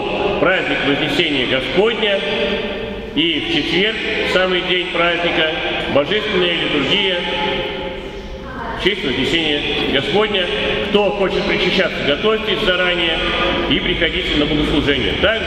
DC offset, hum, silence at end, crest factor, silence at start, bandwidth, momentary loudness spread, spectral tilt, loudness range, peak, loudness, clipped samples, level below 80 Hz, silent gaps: under 0.1%; none; 0 s; 18 dB; 0 s; 13.5 kHz; 4 LU; -5 dB/octave; 2 LU; 0 dBFS; -16 LUFS; under 0.1%; -34 dBFS; none